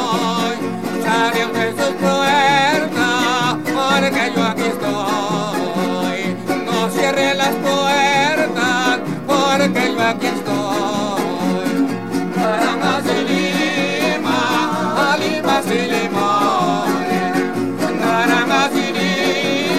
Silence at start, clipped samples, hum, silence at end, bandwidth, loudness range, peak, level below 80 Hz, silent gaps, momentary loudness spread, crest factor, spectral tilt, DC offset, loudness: 0 s; under 0.1%; none; 0 s; 16.5 kHz; 3 LU; -2 dBFS; -56 dBFS; none; 6 LU; 14 dB; -4 dB/octave; 0.9%; -17 LUFS